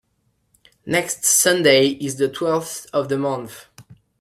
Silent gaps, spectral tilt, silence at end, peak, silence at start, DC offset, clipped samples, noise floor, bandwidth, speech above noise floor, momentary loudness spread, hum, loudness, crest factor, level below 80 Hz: none; -2.5 dB/octave; 0.25 s; -2 dBFS; 0.85 s; under 0.1%; under 0.1%; -67 dBFS; 16 kHz; 48 dB; 12 LU; none; -18 LUFS; 20 dB; -62 dBFS